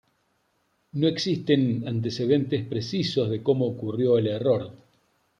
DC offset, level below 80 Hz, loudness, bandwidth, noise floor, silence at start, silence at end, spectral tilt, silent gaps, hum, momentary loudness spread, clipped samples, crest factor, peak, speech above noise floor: under 0.1%; -66 dBFS; -25 LUFS; 9.8 kHz; -71 dBFS; 0.95 s; 0.65 s; -7 dB/octave; none; none; 6 LU; under 0.1%; 18 dB; -6 dBFS; 46 dB